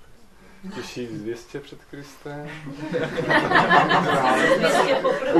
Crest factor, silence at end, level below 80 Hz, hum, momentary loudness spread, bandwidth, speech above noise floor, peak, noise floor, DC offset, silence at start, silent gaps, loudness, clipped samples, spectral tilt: 18 dB; 0 s; -54 dBFS; none; 21 LU; 13 kHz; 25 dB; -4 dBFS; -47 dBFS; under 0.1%; 0 s; none; -19 LUFS; under 0.1%; -4.5 dB/octave